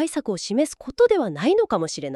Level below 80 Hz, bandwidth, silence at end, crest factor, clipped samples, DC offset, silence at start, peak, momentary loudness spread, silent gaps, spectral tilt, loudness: -56 dBFS; 12.5 kHz; 0 s; 16 dB; under 0.1%; under 0.1%; 0 s; -6 dBFS; 7 LU; none; -4.5 dB/octave; -22 LUFS